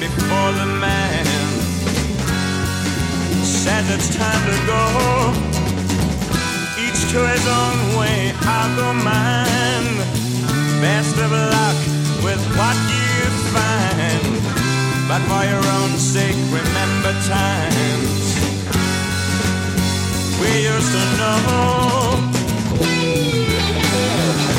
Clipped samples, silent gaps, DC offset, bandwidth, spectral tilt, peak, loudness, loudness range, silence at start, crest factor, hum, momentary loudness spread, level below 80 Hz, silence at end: under 0.1%; none; under 0.1%; 17 kHz; -4.5 dB/octave; -4 dBFS; -17 LUFS; 1 LU; 0 s; 14 dB; none; 4 LU; -34 dBFS; 0 s